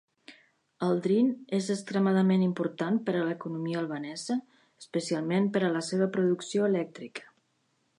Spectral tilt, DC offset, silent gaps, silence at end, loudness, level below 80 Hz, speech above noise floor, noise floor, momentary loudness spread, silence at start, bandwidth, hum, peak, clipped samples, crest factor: -6.5 dB/octave; under 0.1%; none; 0.75 s; -29 LUFS; -80 dBFS; 45 dB; -73 dBFS; 9 LU; 0.3 s; 11 kHz; none; -14 dBFS; under 0.1%; 14 dB